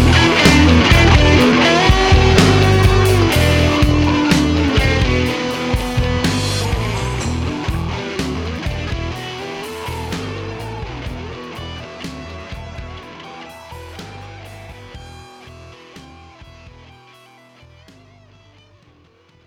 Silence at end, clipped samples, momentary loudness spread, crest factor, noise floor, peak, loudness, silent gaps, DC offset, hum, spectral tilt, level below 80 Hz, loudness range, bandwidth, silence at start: 3.4 s; under 0.1%; 24 LU; 16 dB; -51 dBFS; 0 dBFS; -15 LUFS; none; under 0.1%; none; -5.5 dB/octave; -24 dBFS; 23 LU; 17.5 kHz; 0 s